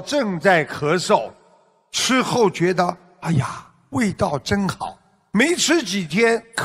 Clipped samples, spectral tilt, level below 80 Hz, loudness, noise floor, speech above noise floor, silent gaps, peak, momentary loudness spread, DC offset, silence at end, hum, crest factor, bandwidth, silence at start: under 0.1%; -4 dB/octave; -52 dBFS; -20 LUFS; -56 dBFS; 37 dB; none; -2 dBFS; 12 LU; under 0.1%; 0 s; none; 18 dB; 16 kHz; 0 s